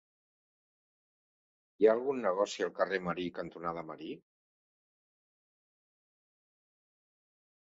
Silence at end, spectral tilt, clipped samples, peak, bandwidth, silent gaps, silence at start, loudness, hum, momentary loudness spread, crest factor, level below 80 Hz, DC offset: 3.55 s; -4 dB/octave; under 0.1%; -14 dBFS; 7.4 kHz; none; 1.8 s; -33 LUFS; none; 16 LU; 24 dB; -74 dBFS; under 0.1%